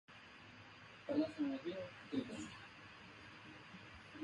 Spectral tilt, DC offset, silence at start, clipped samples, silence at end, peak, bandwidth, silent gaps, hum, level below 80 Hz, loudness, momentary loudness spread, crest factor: -5.5 dB/octave; under 0.1%; 0.1 s; under 0.1%; 0 s; -28 dBFS; 11 kHz; none; none; -74 dBFS; -46 LUFS; 17 LU; 20 dB